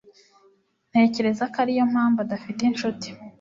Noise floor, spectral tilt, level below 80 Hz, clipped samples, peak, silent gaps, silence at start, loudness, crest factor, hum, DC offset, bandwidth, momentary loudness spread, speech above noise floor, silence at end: -62 dBFS; -5.5 dB/octave; -66 dBFS; under 0.1%; -6 dBFS; none; 0.95 s; -23 LUFS; 18 dB; none; under 0.1%; 7.6 kHz; 9 LU; 39 dB; 0.1 s